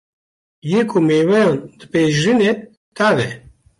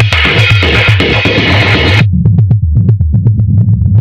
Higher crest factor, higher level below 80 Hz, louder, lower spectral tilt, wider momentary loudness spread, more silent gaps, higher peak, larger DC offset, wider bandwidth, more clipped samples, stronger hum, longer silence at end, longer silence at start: about the same, 12 dB vs 8 dB; second, -54 dBFS vs -20 dBFS; second, -16 LUFS vs -8 LUFS; about the same, -6 dB/octave vs -6.5 dB/octave; first, 12 LU vs 3 LU; first, 2.77-2.92 s vs none; second, -4 dBFS vs 0 dBFS; neither; first, 11.5 kHz vs 8.4 kHz; second, under 0.1% vs 1%; neither; first, 0.4 s vs 0 s; first, 0.65 s vs 0 s